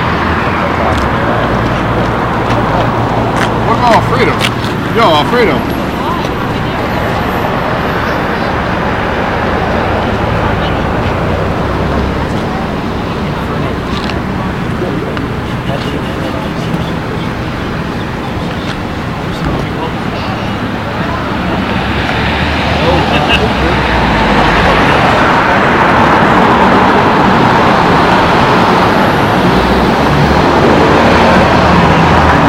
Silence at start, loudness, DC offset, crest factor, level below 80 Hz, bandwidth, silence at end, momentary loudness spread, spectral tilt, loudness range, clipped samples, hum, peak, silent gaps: 0 s; -11 LUFS; under 0.1%; 10 dB; -24 dBFS; 16.5 kHz; 0 s; 9 LU; -6 dB/octave; 9 LU; 0.3%; none; 0 dBFS; none